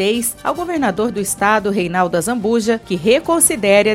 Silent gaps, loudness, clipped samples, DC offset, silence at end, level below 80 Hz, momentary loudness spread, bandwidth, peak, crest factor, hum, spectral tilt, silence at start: none; -16 LUFS; under 0.1%; under 0.1%; 0 s; -46 dBFS; 7 LU; 16.5 kHz; 0 dBFS; 16 dB; none; -3.5 dB/octave; 0 s